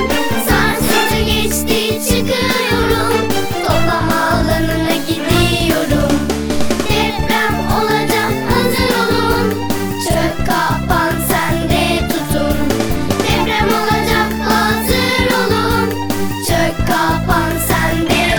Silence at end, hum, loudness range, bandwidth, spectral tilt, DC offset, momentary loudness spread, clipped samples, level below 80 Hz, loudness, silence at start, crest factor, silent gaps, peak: 0 s; none; 1 LU; over 20 kHz; -4.5 dB/octave; under 0.1%; 4 LU; under 0.1%; -26 dBFS; -15 LUFS; 0 s; 14 dB; none; 0 dBFS